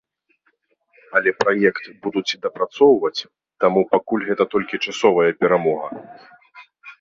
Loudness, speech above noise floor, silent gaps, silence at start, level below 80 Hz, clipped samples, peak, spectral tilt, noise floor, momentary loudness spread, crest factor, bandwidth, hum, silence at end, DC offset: -19 LUFS; 47 dB; none; 1.1 s; -62 dBFS; under 0.1%; -2 dBFS; -5 dB/octave; -66 dBFS; 10 LU; 20 dB; 7.6 kHz; none; 0.1 s; under 0.1%